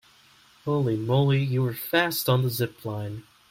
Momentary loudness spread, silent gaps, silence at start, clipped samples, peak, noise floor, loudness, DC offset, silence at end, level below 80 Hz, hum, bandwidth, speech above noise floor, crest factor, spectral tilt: 12 LU; none; 0.65 s; under 0.1%; -8 dBFS; -57 dBFS; -25 LUFS; under 0.1%; 0.3 s; -62 dBFS; none; 16.5 kHz; 32 dB; 18 dB; -6 dB/octave